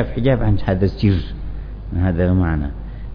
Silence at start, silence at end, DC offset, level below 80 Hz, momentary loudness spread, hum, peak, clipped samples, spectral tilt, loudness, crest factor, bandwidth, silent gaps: 0 s; 0 s; under 0.1%; -26 dBFS; 15 LU; none; -2 dBFS; under 0.1%; -10.5 dB/octave; -19 LUFS; 16 dB; 5.2 kHz; none